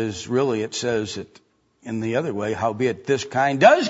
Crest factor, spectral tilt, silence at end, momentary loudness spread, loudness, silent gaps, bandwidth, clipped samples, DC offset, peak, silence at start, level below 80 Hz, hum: 20 dB; -5 dB/octave; 0 s; 13 LU; -22 LUFS; none; 8 kHz; under 0.1%; under 0.1%; -2 dBFS; 0 s; -60 dBFS; none